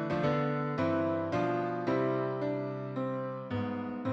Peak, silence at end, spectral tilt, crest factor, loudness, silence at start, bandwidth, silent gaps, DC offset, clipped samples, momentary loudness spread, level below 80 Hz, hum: -18 dBFS; 0 s; -8.5 dB/octave; 14 dB; -33 LUFS; 0 s; 7.8 kHz; none; under 0.1%; under 0.1%; 6 LU; -66 dBFS; none